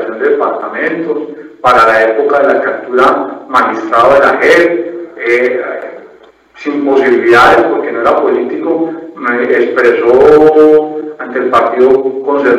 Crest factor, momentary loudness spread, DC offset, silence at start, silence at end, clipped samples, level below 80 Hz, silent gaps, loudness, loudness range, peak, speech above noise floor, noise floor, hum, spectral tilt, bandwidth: 10 dB; 13 LU; under 0.1%; 0 s; 0 s; 0.8%; -46 dBFS; none; -9 LUFS; 2 LU; 0 dBFS; 31 dB; -40 dBFS; none; -5.5 dB/octave; 12 kHz